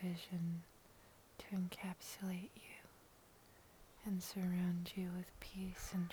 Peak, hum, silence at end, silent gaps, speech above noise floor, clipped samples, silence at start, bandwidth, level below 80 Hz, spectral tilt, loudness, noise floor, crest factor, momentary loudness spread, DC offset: -28 dBFS; none; 0 s; none; 22 dB; under 0.1%; 0 s; over 20 kHz; -66 dBFS; -6 dB/octave; -45 LUFS; -66 dBFS; 18 dB; 23 LU; under 0.1%